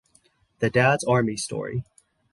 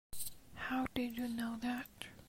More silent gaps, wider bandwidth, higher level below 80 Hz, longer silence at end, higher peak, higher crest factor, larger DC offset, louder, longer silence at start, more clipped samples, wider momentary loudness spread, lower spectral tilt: neither; second, 11.5 kHz vs 16 kHz; first, -56 dBFS vs -62 dBFS; first, 0.5 s vs 0 s; first, -6 dBFS vs -20 dBFS; about the same, 20 dB vs 22 dB; neither; first, -24 LUFS vs -41 LUFS; first, 0.6 s vs 0.1 s; neither; first, 12 LU vs 8 LU; first, -5.5 dB/octave vs -3.5 dB/octave